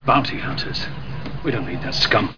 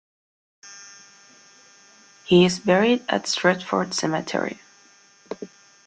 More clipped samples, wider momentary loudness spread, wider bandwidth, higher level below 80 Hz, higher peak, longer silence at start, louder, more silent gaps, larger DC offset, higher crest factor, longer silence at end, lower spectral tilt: neither; second, 13 LU vs 24 LU; second, 5.4 kHz vs 9.2 kHz; first, -40 dBFS vs -62 dBFS; about the same, -2 dBFS vs -4 dBFS; second, 0 s vs 0.65 s; about the same, -22 LUFS vs -21 LUFS; neither; first, 3% vs under 0.1%; about the same, 20 dB vs 22 dB; second, 0 s vs 0.4 s; about the same, -5 dB/octave vs -4.5 dB/octave